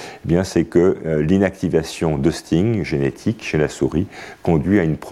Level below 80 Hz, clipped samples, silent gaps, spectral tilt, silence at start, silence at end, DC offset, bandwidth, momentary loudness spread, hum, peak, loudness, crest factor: -40 dBFS; under 0.1%; none; -7 dB/octave; 0 s; 0 s; under 0.1%; 13.5 kHz; 5 LU; none; -4 dBFS; -19 LUFS; 16 dB